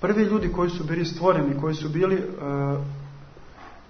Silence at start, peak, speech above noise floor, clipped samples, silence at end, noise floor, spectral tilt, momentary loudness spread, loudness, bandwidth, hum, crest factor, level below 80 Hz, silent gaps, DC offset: 0 s; -6 dBFS; 21 dB; under 0.1%; 0.05 s; -44 dBFS; -7.5 dB/octave; 9 LU; -25 LUFS; 6.6 kHz; none; 20 dB; -44 dBFS; none; under 0.1%